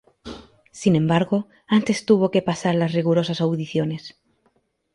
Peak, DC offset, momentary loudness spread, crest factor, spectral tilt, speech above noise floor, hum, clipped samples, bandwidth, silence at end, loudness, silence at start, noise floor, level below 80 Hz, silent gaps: -4 dBFS; under 0.1%; 21 LU; 18 dB; -6.5 dB/octave; 46 dB; none; under 0.1%; 11 kHz; 0.85 s; -21 LUFS; 0.25 s; -66 dBFS; -58 dBFS; none